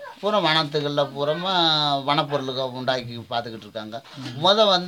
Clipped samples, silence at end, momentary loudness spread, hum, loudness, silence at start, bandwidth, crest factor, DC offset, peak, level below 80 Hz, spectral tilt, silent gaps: under 0.1%; 0 s; 16 LU; none; -22 LUFS; 0 s; 17 kHz; 20 dB; under 0.1%; -4 dBFS; -68 dBFS; -4.5 dB/octave; none